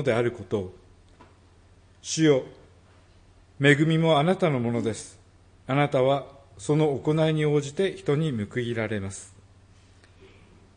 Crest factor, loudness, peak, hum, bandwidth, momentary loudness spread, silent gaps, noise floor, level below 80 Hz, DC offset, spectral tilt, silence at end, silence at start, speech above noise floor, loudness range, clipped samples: 20 dB; -24 LUFS; -6 dBFS; none; 10 kHz; 17 LU; none; -55 dBFS; -60 dBFS; under 0.1%; -6 dB/octave; 1.5 s; 0 s; 31 dB; 5 LU; under 0.1%